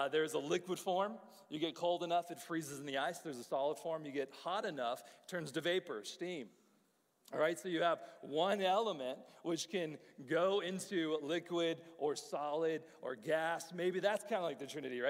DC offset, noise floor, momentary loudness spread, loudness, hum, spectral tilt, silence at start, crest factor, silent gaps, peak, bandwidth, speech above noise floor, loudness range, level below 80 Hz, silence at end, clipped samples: under 0.1%; -76 dBFS; 10 LU; -39 LUFS; none; -4 dB/octave; 0 s; 18 dB; none; -22 dBFS; 16 kHz; 37 dB; 4 LU; under -90 dBFS; 0 s; under 0.1%